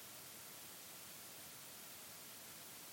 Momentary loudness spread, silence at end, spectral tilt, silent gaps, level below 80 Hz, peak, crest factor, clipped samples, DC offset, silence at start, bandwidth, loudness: 0 LU; 0 s; -1 dB/octave; none; -86 dBFS; -40 dBFS; 14 dB; under 0.1%; under 0.1%; 0 s; 17 kHz; -52 LUFS